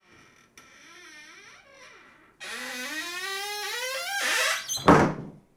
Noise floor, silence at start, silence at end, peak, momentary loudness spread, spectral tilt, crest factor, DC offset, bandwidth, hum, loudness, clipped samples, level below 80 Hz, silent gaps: -57 dBFS; 0.55 s; 0.2 s; -4 dBFS; 26 LU; -3.5 dB/octave; 26 dB; under 0.1%; over 20 kHz; none; -26 LUFS; under 0.1%; -54 dBFS; none